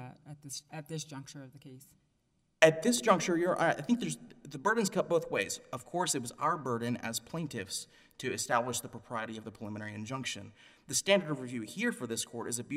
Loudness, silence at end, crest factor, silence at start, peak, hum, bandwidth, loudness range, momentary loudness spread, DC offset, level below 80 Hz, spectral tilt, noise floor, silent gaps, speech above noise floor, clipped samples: -33 LUFS; 0 s; 28 dB; 0 s; -6 dBFS; none; 16 kHz; 7 LU; 16 LU; under 0.1%; -72 dBFS; -3.5 dB/octave; -75 dBFS; none; 41 dB; under 0.1%